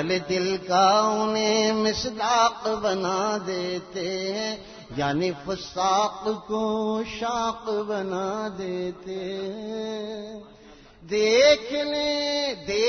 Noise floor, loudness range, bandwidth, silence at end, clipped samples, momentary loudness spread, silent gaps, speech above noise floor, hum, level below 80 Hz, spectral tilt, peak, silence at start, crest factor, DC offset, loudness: -49 dBFS; 7 LU; 6.6 kHz; 0 s; under 0.1%; 13 LU; none; 24 dB; none; -56 dBFS; -3.5 dB/octave; -6 dBFS; 0 s; 18 dB; under 0.1%; -25 LUFS